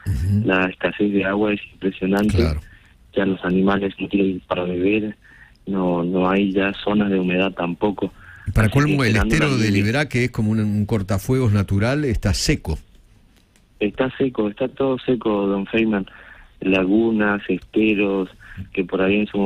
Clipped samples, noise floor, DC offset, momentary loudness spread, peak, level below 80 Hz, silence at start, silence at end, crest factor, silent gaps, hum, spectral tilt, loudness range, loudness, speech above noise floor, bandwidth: under 0.1%; -54 dBFS; under 0.1%; 8 LU; -4 dBFS; -36 dBFS; 0.05 s; 0 s; 16 dB; none; none; -6.5 dB/octave; 3 LU; -20 LUFS; 35 dB; 16 kHz